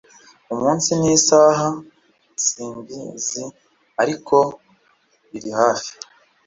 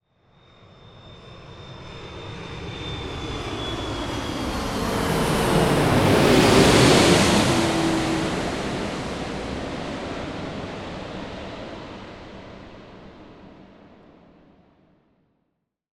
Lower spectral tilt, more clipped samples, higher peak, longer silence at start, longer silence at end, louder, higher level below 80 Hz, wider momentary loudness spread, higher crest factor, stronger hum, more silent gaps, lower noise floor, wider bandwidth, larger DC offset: about the same, -3.5 dB/octave vs -4.5 dB/octave; neither; about the same, -2 dBFS vs -2 dBFS; second, 0.5 s vs 0.85 s; second, 0.55 s vs 2.35 s; first, -18 LUFS vs -21 LUFS; second, -58 dBFS vs -40 dBFS; second, 20 LU vs 25 LU; about the same, 20 dB vs 22 dB; neither; neither; second, -60 dBFS vs -75 dBFS; second, 7.8 kHz vs 17 kHz; neither